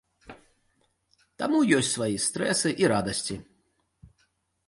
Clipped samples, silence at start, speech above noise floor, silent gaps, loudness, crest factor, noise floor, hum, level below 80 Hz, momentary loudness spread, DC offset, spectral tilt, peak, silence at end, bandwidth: under 0.1%; 0.25 s; 46 dB; none; -25 LUFS; 20 dB; -71 dBFS; none; -60 dBFS; 11 LU; under 0.1%; -3.5 dB/octave; -8 dBFS; 0.6 s; 11.5 kHz